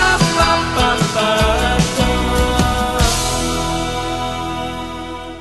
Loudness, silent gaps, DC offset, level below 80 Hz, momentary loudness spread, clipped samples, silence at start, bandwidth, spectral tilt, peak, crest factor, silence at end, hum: -16 LUFS; none; 0.3%; -24 dBFS; 10 LU; under 0.1%; 0 s; 13 kHz; -4 dB/octave; 0 dBFS; 16 dB; 0 s; none